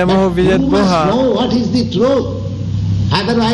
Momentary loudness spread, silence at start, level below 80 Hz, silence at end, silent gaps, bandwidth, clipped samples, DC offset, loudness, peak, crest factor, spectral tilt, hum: 7 LU; 0 s; -32 dBFS; 0 s; none; 11 kHz; under 0.1%; under 0.1%; -14 LUFS; 0 dBFS; 12 dB; -7 dB/octave; none